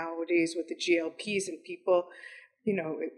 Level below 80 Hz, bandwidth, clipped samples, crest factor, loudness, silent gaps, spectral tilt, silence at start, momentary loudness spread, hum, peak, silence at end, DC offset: -82 dBFS; 11.5 kHz; under 0.1%; 18 dB; -31 LUFS; none; -4 dB/octave; 0 s; 12 LU; none; -14 dBFS; 0.05 s; under 0.1%